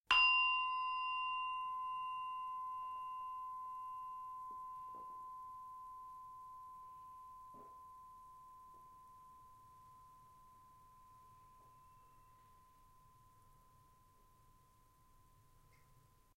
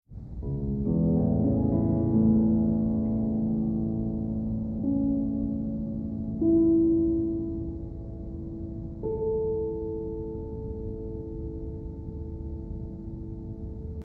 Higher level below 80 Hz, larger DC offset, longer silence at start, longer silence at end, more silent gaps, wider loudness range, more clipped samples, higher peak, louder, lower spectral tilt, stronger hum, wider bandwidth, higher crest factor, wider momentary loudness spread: second, -74 dBFS vs -40 dBFS; neither; about the same, 0.1 s vs 0.1 s; first, 0.35 s vs 0 s; neither; first, 24 LU vs 11 LU; neither; second, -16 dBFS vs -12 dBFS; second, -40 LUFS vs -28 LUFS; second, -0.5 dB/octave vs -14 dB/octave; neither; first, 16 kHz vs 1.6 kHz; first, 28 dB vs 16 dB; first, 25 LU vs 16 LU